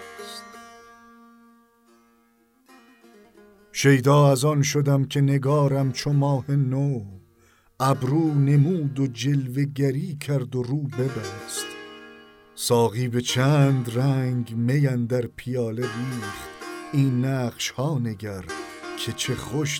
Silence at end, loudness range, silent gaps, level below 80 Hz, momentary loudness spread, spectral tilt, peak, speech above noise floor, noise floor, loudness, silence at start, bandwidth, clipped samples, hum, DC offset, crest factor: 0 s; 6 LU; none; -60 dBFS; 15 LU; -6 dB/octave; -6 dBFS; 40 dB; -62 dBFS; -23 LUFS; 0 s; 16.5 kHz; under 0.1%; none; under 0.1%; 18 dB